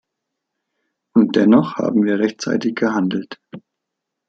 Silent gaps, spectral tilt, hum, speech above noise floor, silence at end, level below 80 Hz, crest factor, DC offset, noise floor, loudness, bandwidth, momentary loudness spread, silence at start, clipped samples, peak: none; -6.5 dB/octave; none; 63 dB; 0.7 s; -64 dBFS; 16 dB; under 0.1%; -80 dBFS; -17 LUFS; 7.6 kHz; 11 LU; 1.15 s; under 0.1%; -2 dBFS